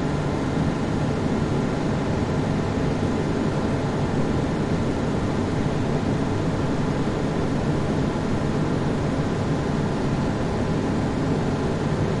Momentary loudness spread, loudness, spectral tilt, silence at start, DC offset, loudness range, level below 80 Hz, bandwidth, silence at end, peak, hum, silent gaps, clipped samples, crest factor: 1 LU; -24 LUFS; -7 dB/octave; 0 s; under 0.1%; 0 LU; -36 dBFS; 11.5 kHz; 0 s; -10 dBFS; none; none; under 0.1%; 12 dB